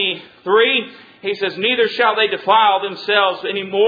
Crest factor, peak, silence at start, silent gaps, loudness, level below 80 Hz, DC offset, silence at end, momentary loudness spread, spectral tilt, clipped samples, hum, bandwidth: 16 dB; 0 dBFS; 0 s; none; -16 LUFS; -68 dBFS; under 0.1%; 0 s; 11 LU; -5 dB/octave; under 0.1%; none; 5 kHz